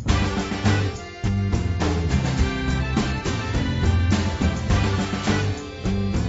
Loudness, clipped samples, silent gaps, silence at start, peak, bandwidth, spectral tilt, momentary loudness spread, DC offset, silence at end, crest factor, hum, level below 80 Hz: -23 LUFS; under 0.1%; none; 0 s; -6 dBFS; 8 kHz; -6 dB/octave; 4 LU; under 0.1%; 0 s; 16 dB; none; -28 dBFS